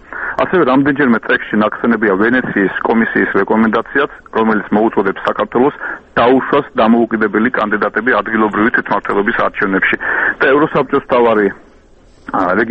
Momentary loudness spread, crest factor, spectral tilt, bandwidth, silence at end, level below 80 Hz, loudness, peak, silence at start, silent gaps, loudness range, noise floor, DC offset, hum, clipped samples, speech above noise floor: 5 LU; 14 dB; -8 dB/octave; 5.6 kHz; 0 s; -46 dBFS; -13 LUFS; 0 dBFS; 0.1 s; none; 1 LU; -44 dBFS; under 0.1%; none; under 0.1%; 31 dB